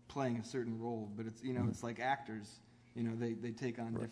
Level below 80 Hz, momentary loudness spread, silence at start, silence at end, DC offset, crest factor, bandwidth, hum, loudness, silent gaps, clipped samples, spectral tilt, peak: -72 dBFS; 10 LU; 0.05 s; 0 s; under 0.1%; 18 dB; 11 kHz; none; -41 LUFS; none; under 0.1%; -6.5 dB/octave; -24 dBFS